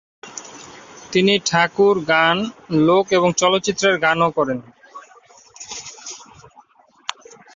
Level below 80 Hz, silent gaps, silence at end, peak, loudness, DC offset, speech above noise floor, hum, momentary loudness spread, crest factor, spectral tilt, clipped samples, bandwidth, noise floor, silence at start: -58 dBFS; none; 0.45 s; -2 dBFS; -17 LUFS; under 0.1%; 35 dB; none; 20 LU; 18 dB; -4 dB/octave; under 0.1%; 7.8 kHz; -52 dBFS; 0.25 s